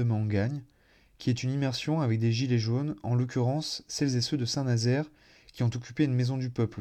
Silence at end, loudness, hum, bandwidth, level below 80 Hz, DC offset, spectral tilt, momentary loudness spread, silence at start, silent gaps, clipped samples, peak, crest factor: 0 s; -29 LUFS; none; 9.8 kHz; -64 dBFS; under 0.1%; -6 dB/octave; 5 LU; 0 s; none; under 0.1%; -14 dBFS; 16 dB